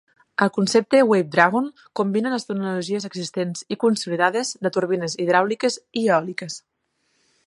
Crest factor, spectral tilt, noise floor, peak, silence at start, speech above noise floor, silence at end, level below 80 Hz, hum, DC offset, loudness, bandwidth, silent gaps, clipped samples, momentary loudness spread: 22 dB; -4.5 dB/octave; -70 dBFS; 0 dBFS; 0.4 s; 49 dB; 0.9 s; -72 dBFS; none; under 0.1%; -21 LUFS; 11.5 kHz; none; under 0.1%; 11 LU